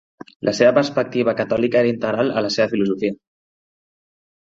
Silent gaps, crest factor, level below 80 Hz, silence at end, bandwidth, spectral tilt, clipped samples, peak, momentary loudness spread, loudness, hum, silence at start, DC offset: none; 20 dB; -58 dBFS; 1.35 s; 7.8 kHz; -5.5 dB/octave; under 0.1%; 0 dBFS; 9 LU; -19 LUFS; none; 0.45 s; under 0.1%